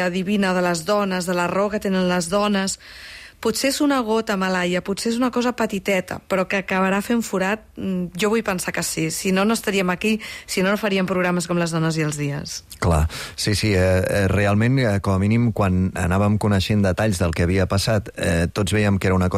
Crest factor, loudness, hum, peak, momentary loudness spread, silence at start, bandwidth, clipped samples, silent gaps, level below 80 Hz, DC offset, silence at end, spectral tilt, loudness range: 12 dB; -21 LUFS; none; -10 dBFS; 6 LU; 0 s; 15.5 kHz; under 0.1%; none; -40 dBFS; under 0.1%; 0 s; -5.5 dB/octave; 3 LU